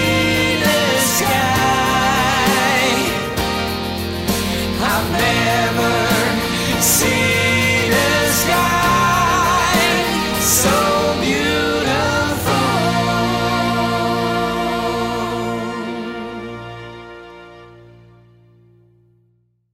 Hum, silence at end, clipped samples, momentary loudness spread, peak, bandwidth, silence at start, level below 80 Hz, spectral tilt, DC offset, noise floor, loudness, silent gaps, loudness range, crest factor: none; 2 s; under 0.1%; 9 LU; -6 dBFS; 16.5 kHz; 0 s; -38 dBFS; -3.5 dB/octave; under 0.1%; -61 dBFS; -16 LUFS; none; 10 LU; 12 dB